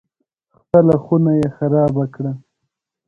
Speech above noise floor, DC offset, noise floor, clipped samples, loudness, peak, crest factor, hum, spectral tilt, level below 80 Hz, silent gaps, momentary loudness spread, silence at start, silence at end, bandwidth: 61 dB; under 0.1%; -76 dBFS; under 0.1%; -16 LUFS; 0 dBFS; 18 dB; none; -11 dB/octave; -50 dBFS; none; 13 LU; 0.75 s; 0.7 s; 5.4 kHz